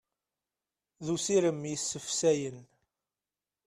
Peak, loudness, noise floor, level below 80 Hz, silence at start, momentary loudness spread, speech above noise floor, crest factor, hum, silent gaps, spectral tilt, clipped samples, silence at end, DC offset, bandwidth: -14 dBFS; -30 LUFS; under -90 dBFS; -72 dBFS; 1 s; 10 LU; over 60 dB; 18 dB; none; none; -4 dB/octave; under 0.1%; 1 s; under 0.1%; 14 kHz